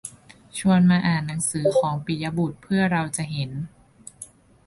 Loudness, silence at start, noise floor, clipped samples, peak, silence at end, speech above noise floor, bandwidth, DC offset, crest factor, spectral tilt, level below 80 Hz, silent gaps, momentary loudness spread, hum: -23 LUFS; 0.05 s; -46 dBFS; under 0.1%; -8 dBFS; 0.4 s; 24 dB; 11.5 kHz; under 0.1%; 16 dB; -5.5 dB/octave; -54 dBFS; none; 21 LU; none